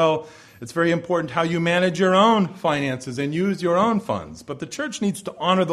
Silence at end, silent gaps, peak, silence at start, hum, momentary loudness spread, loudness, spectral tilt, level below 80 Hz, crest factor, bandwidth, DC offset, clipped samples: 0 s; none; -4 dBFS; 0 s; none; 12 LU; -22 LUFS; -5.5 dB/octave; -58 dBFS; 16 dB; 13.5 kHz; under 0.1%; under 0.1%